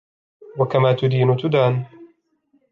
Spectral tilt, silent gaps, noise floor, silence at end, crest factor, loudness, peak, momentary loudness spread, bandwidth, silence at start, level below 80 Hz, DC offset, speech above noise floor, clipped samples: -9 dB/octave; none; -64 dBFS; 0.65 s; 16 dB; -19 LUFS; -4 dBFS; 14 LU; 5.4 kHz; 0.5 s; -62 dBFS; under 0.1%; 46 dB; under 0.1%